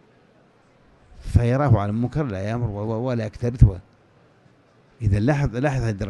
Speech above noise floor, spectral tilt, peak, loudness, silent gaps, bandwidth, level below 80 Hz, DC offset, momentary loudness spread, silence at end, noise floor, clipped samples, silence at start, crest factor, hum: 35 dB; -8.5 dB/octave; 0 dBFS; -22 LUFS; none; 10 kHz; -32 dBFS; under 0.1%; 8 LU; 0 s; -56 dBFS; under 0.1%; 1.2 s; 22 dB; none